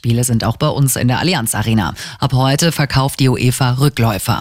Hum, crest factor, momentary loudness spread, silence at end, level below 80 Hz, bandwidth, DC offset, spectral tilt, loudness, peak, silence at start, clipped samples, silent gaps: none; 12 dB; 3 LU; 0 s; -36 dBFS; 16.5 kHz; under 0.1%; -5 dB/octave; -15 LUFS; -2 dBFS; 0.05 s; under 0.1%; none